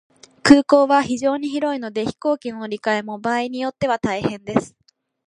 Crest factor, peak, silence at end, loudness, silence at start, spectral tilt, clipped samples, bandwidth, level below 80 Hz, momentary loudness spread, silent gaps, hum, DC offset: 20 dB; 0 dBFS; 0.6 s; -20 LUFS; 0.45 s; -5 dB/octave; under 0.1%; 10.5 kHz; -54 dBFS; 11 LU; none; none; under 0.1%